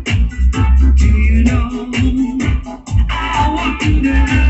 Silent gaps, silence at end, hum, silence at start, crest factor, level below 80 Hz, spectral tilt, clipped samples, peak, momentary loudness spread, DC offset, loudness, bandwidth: none; 0 s; none; 0 s; 12 dB; -14 dBFS; -6.5 dB/octave; under 0.1%; 0 dBFS; 6 LU; under 0.1%; -15 LUFS; 8.2 kHz